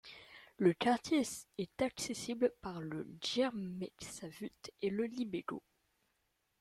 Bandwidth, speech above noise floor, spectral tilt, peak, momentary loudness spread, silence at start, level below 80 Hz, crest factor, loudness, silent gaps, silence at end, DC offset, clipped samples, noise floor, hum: 15 kHz; 44 dB; -4.5 dB/octave; -18 dBFS; 14 LU; 0.05 s; -70 dBFS; 20 dB; -38 LUFS; none; 1 s; under 0.1%; under 0.1%; -81 dBFS; none